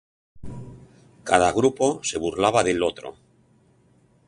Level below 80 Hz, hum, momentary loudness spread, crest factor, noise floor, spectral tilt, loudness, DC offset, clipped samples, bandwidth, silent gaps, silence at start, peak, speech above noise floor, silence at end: -50 dBFS; none; 21 LU; 22 dB; -59 dBFS; -4 dB/octave; -22 LUFS; under 0.1%; under 0.1%; 11.5 kHz; none; 0.35 s; -2 dBFS; 38 dB; 1.15 s